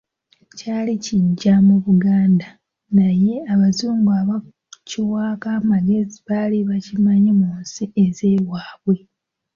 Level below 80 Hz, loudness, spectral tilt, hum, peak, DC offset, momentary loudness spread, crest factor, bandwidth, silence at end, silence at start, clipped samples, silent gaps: -54 dBFS; -18 LUFS; -7.5 dB/octave; none; -4 dBFS; under 0.1%; 10 LU; 12 dB; 7.2 kHz; 0.6 s; 0.55 s; under 0.1%; none